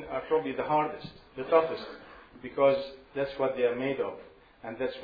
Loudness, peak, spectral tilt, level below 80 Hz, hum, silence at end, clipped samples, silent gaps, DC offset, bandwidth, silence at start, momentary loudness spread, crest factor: -29 LUFS; -10 dBFS; -8 dB/octave; -62 dBFS; none; 0 s; under 0.1%; none; under 0.1%; 5 kHz; 0 s; 19 LU; 20 dB